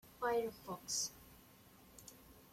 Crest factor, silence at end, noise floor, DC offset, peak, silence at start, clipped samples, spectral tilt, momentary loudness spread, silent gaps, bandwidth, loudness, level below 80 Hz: 20 dB; 0.05 s; -63 dBFS; under 0.1%; -26 dBFS; 0.05 s; under 0.1%; -1.5 dB/octave; 23 LU; none; 16.5 kHz; -41 LUFS; -70 dBFS